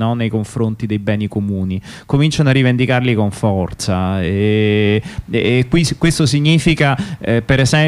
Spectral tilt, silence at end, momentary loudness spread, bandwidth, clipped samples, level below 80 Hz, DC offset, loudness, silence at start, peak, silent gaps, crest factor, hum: -6 dB/octave; 0 s; 7 LU; 13.5 kHz; under 0.1%; -36 dBFS; under 0.1%; -15 LUFS; 0 s; -2 dBFS; none; 12 dB; none